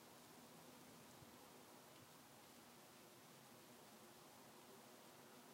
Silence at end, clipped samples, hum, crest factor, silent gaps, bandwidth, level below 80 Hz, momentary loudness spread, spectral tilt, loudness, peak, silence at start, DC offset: 0 s; under 0.1%; none; 16 dB; none; 16 kHz; under -90 dBFS; 1 LU; -3 dB/octave; -63 LUFS; -48 dBFS; 0 s; under 0.1%